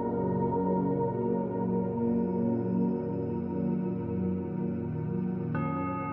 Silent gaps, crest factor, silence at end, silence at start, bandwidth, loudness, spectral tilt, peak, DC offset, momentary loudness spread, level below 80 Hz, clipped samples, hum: none; 12 dB; 0 s; 0 s; 3.4 kHz; -31 LUFS; -13 dB/octave; -18 dBFS; under 0.1%; 4 LU; -60 dBFS; under 0.1%; none